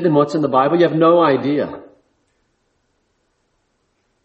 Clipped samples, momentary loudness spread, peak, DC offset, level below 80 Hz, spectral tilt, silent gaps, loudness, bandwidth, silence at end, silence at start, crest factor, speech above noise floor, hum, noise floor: under 0.1%; 11 LU; -2 dBFS; under 0.1%; -62 dBFS; -8 dB/octave; none; -15 LUFS; 8.2 kHz; 2.4 s; 0 s; 16 dB; 52 dB; none; -66 dBFS